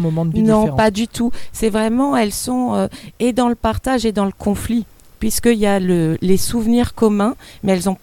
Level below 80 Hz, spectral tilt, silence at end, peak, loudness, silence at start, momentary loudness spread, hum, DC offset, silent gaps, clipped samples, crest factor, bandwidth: -36 dBFS; -5.5 dB/octave; 0.05 s; -2 dBFS; -17 LUFS; 0 s; 7 LU; none; under 0.1%; none; under 0.1%; 16 dB; 17.5 kHz